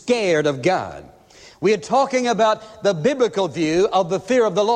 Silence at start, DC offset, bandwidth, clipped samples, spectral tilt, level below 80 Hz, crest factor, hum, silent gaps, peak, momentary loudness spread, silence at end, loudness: 0.05 s; under 0.1%; 10.5 kHz; under 0.1%; -5 dB/octave; -56 dBFS; 14 dB; none; none; -4 dBFS; 4 LU; 0 s; -19 LUFS